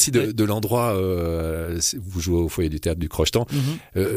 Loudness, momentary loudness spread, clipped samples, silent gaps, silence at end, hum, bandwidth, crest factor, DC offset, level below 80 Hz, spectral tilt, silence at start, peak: -23 LUFS; 5 LU; under 0.1%; none; 0 s; none; 15.5 kHz; 16 dB; under 0.1%; -36 dBFS; -4.5 dB/octave; 0 s; -6 dBFS